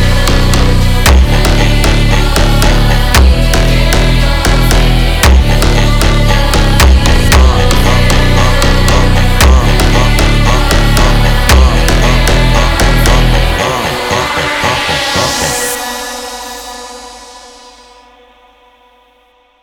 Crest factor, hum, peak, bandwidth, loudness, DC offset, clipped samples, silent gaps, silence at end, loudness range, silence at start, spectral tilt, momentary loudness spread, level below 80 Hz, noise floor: 8 dB; none; 0 dBFS; 20 kHz; -9 LUFS; under 0.1%; 1%; none; 2.15 s; 7 LU; 0 s; -4.5 dB/octave; 6 LU; -10 dBFS; -49 dBFS